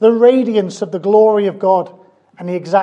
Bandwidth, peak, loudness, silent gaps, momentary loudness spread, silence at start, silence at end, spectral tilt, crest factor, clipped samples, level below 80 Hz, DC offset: 8.8 kHz; 0 dBFS; -14 LUFS; none; 13 LU; 0 s; 0 s; -7 dB/octave; 14 dB; under 0.1%; -72 dBFS; under 0.1%